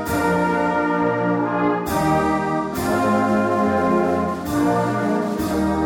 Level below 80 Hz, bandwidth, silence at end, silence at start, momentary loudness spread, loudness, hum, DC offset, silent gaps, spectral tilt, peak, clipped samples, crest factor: -42 dBFS; 18 kHz; 0 s; 0 s; 3 LU; -20 LUFS; none; under 0.1%; none; -6.5 dB/octave; -8 dBFS; under 0.1%; 10 dB